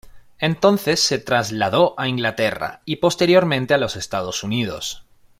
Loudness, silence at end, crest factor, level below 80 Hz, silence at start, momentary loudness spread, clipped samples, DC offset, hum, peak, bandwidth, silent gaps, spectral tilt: -19 LUFS; 0.4 s; 18 dB; -52 dBFS; 0.15 s; 10 LU; under 0.1%; under 0.1%; none; -2 dBFS; 16 kHz; none; -4 dB/octave